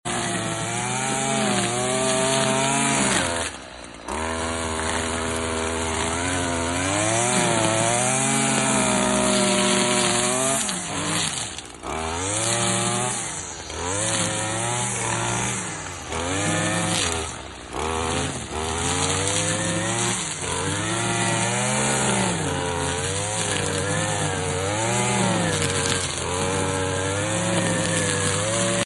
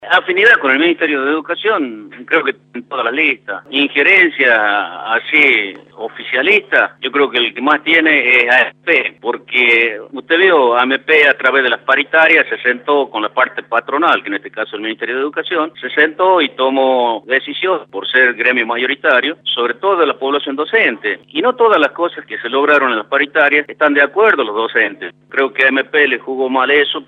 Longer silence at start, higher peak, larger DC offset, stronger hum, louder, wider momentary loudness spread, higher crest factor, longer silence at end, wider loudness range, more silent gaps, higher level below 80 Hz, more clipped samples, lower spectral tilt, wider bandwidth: about the same, 0.05 s vs 0 s; second, -4 dBFS vs 0 dBFS; neither; neither; second, -22 LUFS vs -13 LUFS; about the same, 8 LU vs 10 LU; about the same, 18 dB vs 14 dB; about the same, 0 s vs 0.05 s; about the same, 5 LU vs 4 LU; neither; first, -44 dBFS vs -72 dBFS; neither; second, -3 dB/octave vs -4.5 dB/octave; first, 12 kHz vs 8.6 kHz